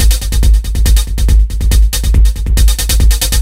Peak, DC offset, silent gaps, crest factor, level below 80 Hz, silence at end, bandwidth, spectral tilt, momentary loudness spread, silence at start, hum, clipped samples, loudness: 0 dBFS; 0.5%; none; 8 dB; -8 dBFS; 0 s; 16.5 kHz; -4 dB/octave; 2 LU; 0 s; none; under 0.1%; -12 LUFS